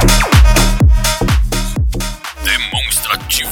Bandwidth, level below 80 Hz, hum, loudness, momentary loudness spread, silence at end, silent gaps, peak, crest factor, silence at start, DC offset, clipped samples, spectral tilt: 19 kHz; -14 dBFS; none; -13 LUFS; 9 LU; 0 s; none; 0 dBFS; 12 dB; 0 s; under 0.1%; under 0.1%; -3.5 dB/octave